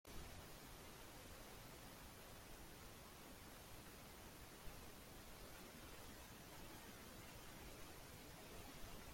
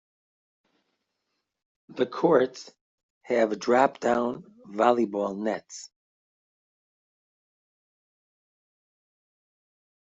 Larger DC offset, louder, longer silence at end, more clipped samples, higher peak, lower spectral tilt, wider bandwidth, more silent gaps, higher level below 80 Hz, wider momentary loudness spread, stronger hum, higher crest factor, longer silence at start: neither; second, -58 LUFS vs -25 LUFS; second, 0 s vs 4.2 s; neither; second, -40 dBFS vs -6 dBFS; second, -3.5 dB/octave vs -5.5 dB/octave; first, 16.5 kHz vs 8 kHz; second, none vs 2.81-3.21 s; first, -66 dBFS vs -74 dBFS; second, 2 LU vs 19 LU; neither; second, 16 dB vs 24 dB; second, 0.05 s vs 1.9 s